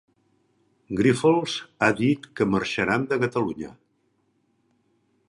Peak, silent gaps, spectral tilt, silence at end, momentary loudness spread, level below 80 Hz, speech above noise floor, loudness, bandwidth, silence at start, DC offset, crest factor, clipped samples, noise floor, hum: -4 dBFS; none; -6 dB/octave; 1.55 s; 10 LU; -58 dBFS; 46 dB; -23 LUFS; 11.5 kHz; 0.9 s; under 0.1%; 22 dB; under 0.1%; -69 dBFS; none